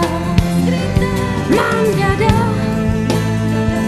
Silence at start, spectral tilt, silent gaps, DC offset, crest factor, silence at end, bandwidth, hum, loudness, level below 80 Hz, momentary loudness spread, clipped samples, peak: 0 s; -6.5 dB/octave; none; under 0.1%; 14 dB; 0 s; 14 kHz; none; -15 LUFS; -28 dBFS; 3 LU; under 0.1%; 0 dBFS